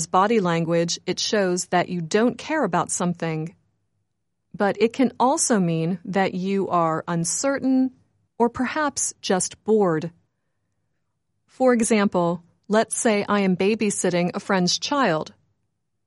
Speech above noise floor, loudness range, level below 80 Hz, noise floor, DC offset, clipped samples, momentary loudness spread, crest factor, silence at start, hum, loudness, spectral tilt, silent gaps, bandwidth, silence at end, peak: 56 dB; 3 LU; -66 dBFS; -77 dBFS; under 0.1%; under 0.1%; 5 LU; 18 dB; 0 s; none; -22 LUFS; -4.5 dB/octave; none; 11.5 kHz; 0.75 s; -6 dBFS